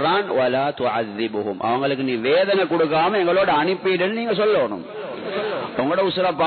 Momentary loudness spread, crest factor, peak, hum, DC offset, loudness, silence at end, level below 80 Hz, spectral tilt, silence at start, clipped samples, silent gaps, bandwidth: 7 LU; 12 dB; -8 dBFS; none; under 0.1%; -20 LUFS; 0 s; -60 dBFS; -10 dB/octave; 0 s; under 0.1%; none; 4.6 kHz